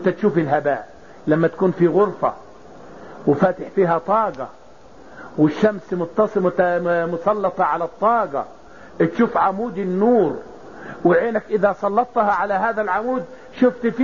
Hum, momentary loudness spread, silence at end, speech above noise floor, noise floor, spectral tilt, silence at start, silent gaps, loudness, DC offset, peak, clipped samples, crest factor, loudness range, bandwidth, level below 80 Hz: none; 12 LU; 0 s; 27 dB; -45 dBFS; -6.5 dB/octave; 0 s; none; -19 LUFS; 0.5%; -4 dBFS; under 0.1%; 16 dB; 2 LU; 7.2 kHz; -56 dBFS